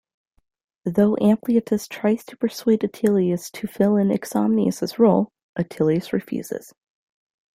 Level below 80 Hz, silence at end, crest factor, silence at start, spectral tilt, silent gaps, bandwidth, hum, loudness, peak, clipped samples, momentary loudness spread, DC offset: -62 dBFS; 1 s; 18 dB; 0.85 s; -7 dB/octave; 5.43-5.54 s; 16 kHz; none; -21 LUFS; -4 dBFS; under 0.1%; 11 LU; under 0.1%